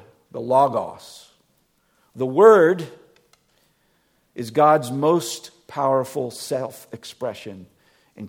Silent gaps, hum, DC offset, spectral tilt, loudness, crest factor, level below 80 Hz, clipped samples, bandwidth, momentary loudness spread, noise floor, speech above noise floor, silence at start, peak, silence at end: none; none; under 0.1%; -5.5 dB/octave; -19 LUFS; 22 dB; -70 dBFS; under 0.1%; 17 kHz; 23 LU; -65 dBFS; 45 dB; 0.35 s; 0 dBFS; 0 s